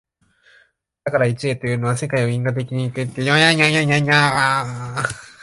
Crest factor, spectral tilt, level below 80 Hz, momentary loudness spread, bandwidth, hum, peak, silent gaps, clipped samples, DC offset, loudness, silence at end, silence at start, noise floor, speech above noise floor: 20 dB; -5 dB/octave; -54 dBFS; 11 LU; 11.5 kHz; none; 0 dBFS; none; under 0.1%; under 0.1%; -18 LUFS; 0.15 s; 1.05 s; -57 dBFS; 39 dB